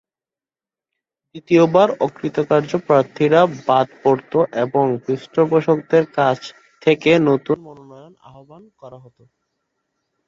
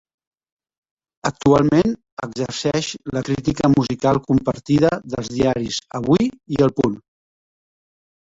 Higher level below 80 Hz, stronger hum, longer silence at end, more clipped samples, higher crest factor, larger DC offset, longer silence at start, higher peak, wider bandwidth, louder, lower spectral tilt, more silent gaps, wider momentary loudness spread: second, -62 dBFS vs -46 dBFS; neither; about the same, 1.3 s vs 1.35 s; neither; about the same, 18 dB vs 18 dB; neither; about the same, 1.35 s vs 1.25 s; about the same, -2 dBFS vs -2 dBFS; about the same, 7.4 kHz vs 8 kHz; about the same, -17 LUFS vs -19 LUFS; about the same, -7 dB/octave vs -6 dB/octave; second, none vs 2.12-2.17 s; about the same, 8 LU vs 10 LU